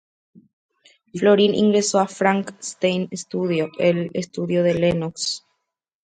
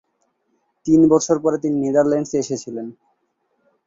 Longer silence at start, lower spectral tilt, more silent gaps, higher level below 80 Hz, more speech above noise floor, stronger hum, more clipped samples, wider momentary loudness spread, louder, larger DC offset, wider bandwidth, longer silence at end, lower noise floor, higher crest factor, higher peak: first, 1.15 s vs 0.85 s; about the same, -5 dB/octave vs -6 dB/octave; neither; about the same, -58 dBFS vs -58 dBFS; first, 58 dB vs 51 dB; neither; neither; second, 11 LU vs 17 LU; second, -21 LUFS vs -18 LUFS; neither; first, 9.4 kHz vs 7.8 kHz; second, 0.65 s vs 0.95 s; first, -78 dBFS vs -69 dBFS; about the same, 18 dB vs 18 dB; about the same, -2 dBFS vs -2 dBFS